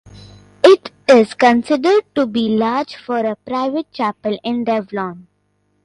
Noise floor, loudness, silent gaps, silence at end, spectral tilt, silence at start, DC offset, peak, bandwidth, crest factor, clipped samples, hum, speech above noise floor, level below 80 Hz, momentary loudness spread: -64 dBFS; -16 LUFS; none; 0.65 s; -5.5 dB/octave; 0.15 s; under 0.1%; 0 dBFS; 11 kHz; 16 dB; under 0.1%; none; 47 dB; -56 dBFS; 11 LU